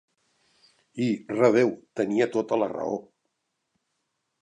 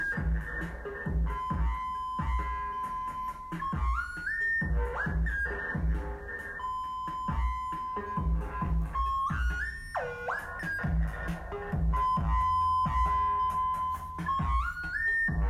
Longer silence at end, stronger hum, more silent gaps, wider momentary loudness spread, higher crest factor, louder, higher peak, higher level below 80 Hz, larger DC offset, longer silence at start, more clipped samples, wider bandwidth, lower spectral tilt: first, 1.4 s vs 0 s; neither; neither; first, 11 LU vs 8 LU; first, 22 dB vs 12 dB; first, -25 LUFS vs -32 LUFS; first, -6 dBFS vs -18 dBFS; second, -74 dBFS vs -36 dBFS; neither; first, 0.95 s vs 0 s; neither; second, 10 kHz vs 12 kHz; about the same, -6.5 dB/octave vs -7 dB/octave